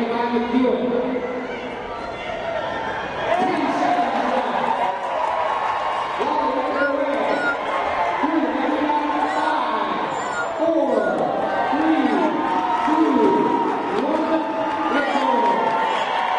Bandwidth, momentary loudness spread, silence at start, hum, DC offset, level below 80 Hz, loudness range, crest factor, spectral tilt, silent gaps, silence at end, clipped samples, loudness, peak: 10.5 kHz; 7 LU; 0 s; none; under 0.1%; -54 dBFS; 4 LU; 16 dB; -5 dB/octave; none; 0 s; under 0.1%; -21 LUFS; -6 dBFS